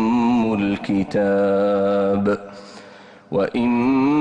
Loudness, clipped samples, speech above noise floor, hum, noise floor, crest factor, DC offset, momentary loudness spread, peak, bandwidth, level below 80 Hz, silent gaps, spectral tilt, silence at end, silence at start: -19 LUFS; under 0.1%; 25 dB; none; -43 dBFS; 10 dB; under 0.1%; 9 LU; -10 dBFS; 8.8 kHz; -52 dBFS; none; -8 dB/octave; 0 s; 0 s